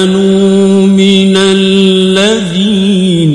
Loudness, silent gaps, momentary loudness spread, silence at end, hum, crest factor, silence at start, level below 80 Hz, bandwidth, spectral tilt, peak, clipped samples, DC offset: -7 LUFS; none; 3 LU; 0 s; none; 6 dB; 0 s; -42 dBFS; 11 kHz; -5.5 dB/octave; 0 dBFS; 0.3%; under 0.1%